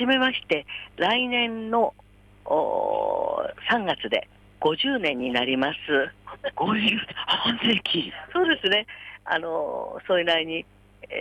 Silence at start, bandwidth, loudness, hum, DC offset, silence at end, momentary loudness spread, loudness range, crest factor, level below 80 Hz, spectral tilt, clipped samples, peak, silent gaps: 0 s; 11 kHz; -24 LUFS; 50 Hz at -55 dBFS; under 0.1%; 0 s; 9 LU; 2 LU; 16 dB; -58 dBFS; -5.5 dB/octave; under 0.1%; -10 dBFS; none